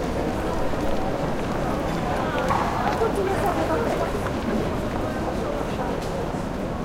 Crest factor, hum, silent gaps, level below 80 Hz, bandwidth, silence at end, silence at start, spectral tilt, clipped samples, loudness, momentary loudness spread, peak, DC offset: 16 dB; none; none; -34 dBFS; 16.5 kHz; 0 s; 0 s; -6 dB/octave; under 0.1%; -25 LUFS; 4 LU; -8 dBFS; under 0.1%